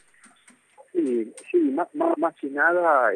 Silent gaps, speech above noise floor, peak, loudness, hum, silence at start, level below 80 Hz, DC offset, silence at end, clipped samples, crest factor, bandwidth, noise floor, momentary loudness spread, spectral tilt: none; 35 dB; -8 dBFS; -23 LUFS; none; 0.95 s; -88 dBFS; under 0.1%; 0 s; under 0.1%; 16 dB; 9.8 kHz; -57 dBFS; 8 LU; -5.5 dB/octave